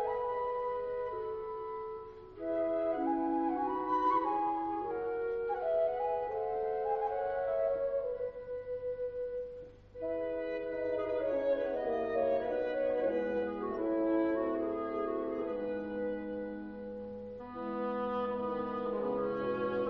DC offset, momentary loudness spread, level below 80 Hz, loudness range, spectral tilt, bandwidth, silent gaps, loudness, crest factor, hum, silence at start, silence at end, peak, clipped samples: under 0.1%; 10 LU; -62 dBFS; 5 LU; -5 dB/octave; 5.4 kHz; none; -35 LUFS; 14 dB; none; 0 s; 0 s; -20 dBFS; under 0.1%